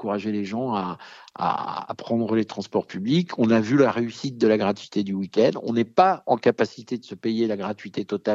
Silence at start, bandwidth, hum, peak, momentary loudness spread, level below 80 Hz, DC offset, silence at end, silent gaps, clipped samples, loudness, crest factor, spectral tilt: 0 s; 7.8 kHz; none; -4 dBFS; 11 LU; -72 dBFS; under 0.1%; 0 s; none; under 0.1%; -24 LUFS; 20 dB; -7 dB/octave